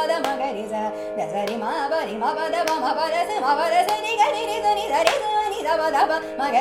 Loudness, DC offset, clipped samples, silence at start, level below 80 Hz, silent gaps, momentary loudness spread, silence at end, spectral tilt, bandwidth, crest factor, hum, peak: -22 LUFS; under 0.1%; under 0.1%; 0 s; -58 dBFS; none; 7 LU; 0 s; -2.5 dB/octave; 16 kHz; 22 dB; none; 0 dBFS